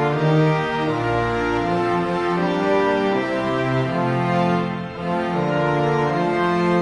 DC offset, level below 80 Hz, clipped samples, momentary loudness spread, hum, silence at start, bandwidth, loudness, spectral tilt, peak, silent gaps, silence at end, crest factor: under 0.1%; -46 dBFS; under 0.1%; 3 LU; none; 0 s; 10.5 kHz; -20 LUFS; -7.5 dB/octave; -8 dBFS; none; 0 s; 12 dB